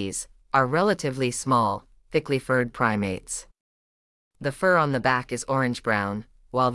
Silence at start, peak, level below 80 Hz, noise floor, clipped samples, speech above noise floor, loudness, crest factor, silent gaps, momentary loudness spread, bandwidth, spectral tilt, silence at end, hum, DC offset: 0 s; -6 dBFS; -54 dBFS; under -90 dBFS; under 0.1%; over 66 dB; -25 LUFS; 20 dB; 3.60-4.31 s; 11 LU; 12 kHz; -5 dB/octave; 0 s; none; under 0.1%